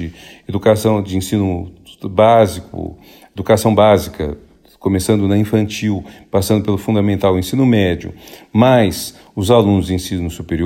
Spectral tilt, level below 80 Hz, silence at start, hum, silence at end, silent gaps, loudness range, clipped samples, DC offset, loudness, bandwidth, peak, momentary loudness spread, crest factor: -6.5 dB/octave; -40 dBFS; 0 s; none; 0 s; none; 2 LU; under 0.1%; under 0.1%; -15 LUFS; 16.5 kHz; 0 dBFS; 15 LU; 16 dB